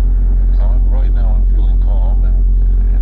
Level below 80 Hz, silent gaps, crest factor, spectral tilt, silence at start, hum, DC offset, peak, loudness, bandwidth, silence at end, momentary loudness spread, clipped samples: -10 dBFS; none; 6 dB; -10.5 dB/octave; 0 s; none; under 0.1%; -4 dBFS; -15 LUFS; 1.6 kHz; 0 s; 0 LU; under 0.1%